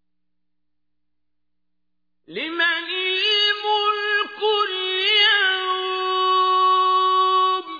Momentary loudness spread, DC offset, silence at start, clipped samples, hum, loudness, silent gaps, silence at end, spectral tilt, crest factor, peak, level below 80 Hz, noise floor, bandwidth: 7 LU; under 0.1%; 2.3 s; under 0.1%; 60 Hz at -80 dBFS; -18 LUFS; none; 0 s; -1.5 dB/octave; 16 dB; -6 dBFS; -76 dBFS; -83 dBFS; 5 kHz